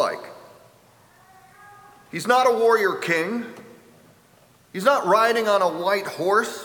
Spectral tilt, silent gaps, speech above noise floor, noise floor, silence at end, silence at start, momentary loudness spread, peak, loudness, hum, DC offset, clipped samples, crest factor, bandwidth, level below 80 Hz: -4 dB/octave; none; 35 dB; -55 dBFS; 0 s; 0 s; 17 LU; -4 dBFS; -21 LUFS; none; under 0.1%; under 0.1%; 20 dB; over 20 kHz; -74 dBFS